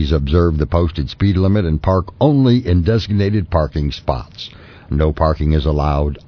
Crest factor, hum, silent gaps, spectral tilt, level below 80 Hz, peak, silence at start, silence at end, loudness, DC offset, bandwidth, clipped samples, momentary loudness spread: 14 dB; none; none; -9 dB/octave; -24 dBFS; 0 dBFS; 0 s; 0.1 s; -16 LUFS; under 0.1%; 5.4 kHz; under 0.1%; 9 LU